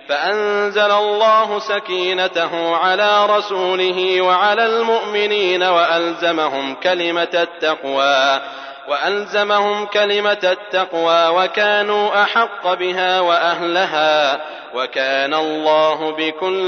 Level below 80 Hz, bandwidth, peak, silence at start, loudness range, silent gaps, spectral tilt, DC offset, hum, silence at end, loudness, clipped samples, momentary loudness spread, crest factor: -80 dBFS; 6.6 kHz; -2 dBFS; 0.05 s; 2 LU; none; -3 dB/octave; under 0.1%; none; 0 s; -16 LUFS; under 0.1%; 6 LU; 14 dB